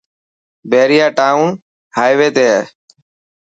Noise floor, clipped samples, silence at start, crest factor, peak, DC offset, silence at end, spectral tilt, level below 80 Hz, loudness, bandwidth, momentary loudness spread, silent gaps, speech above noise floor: under -90 dBFS; under 0.1%; 0.65 s; 14 dB; 0 dBFS; under 0.1%; 0.75 s; -4.5 dB/octave; -64 dBFS; -12 LUFS; 8 kHz; 11 LU; 1.62-1.91 s; over 79 dB